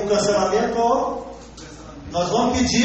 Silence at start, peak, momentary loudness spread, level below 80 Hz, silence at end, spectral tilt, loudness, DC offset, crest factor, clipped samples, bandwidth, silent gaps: 0 s; -6 dBFS; 20 LU; -42 dBFS; 0 s; -4 dB/octave; -20 LUFS; under 0.1%; 14 dB; under 0.1%; 8.4 kHz; none